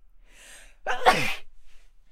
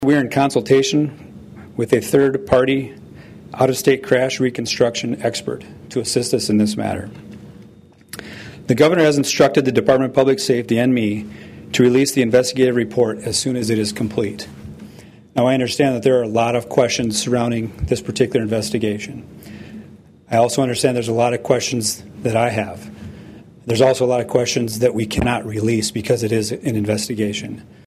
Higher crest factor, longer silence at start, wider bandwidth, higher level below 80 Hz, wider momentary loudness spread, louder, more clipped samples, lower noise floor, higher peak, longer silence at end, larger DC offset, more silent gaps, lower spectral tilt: first, 26 dB vs 16 dB; first, 0.15 s vs 0 s; about the same, 16 kHz vs 15.5 kHz; about the same, -46 dBFS vs -46 dBFS; about the same, 17 LU vs 19 LU; second, -25 LUFS vs -18 LUFS; neither; first, -50 dBFS vs -45 dBFS; about the same, -2 dBFS vs -2 dBFS; about the same, 0.35 s vs 0.25 s; neither; neither; second, -3 dB/octave vs -5 dB/octave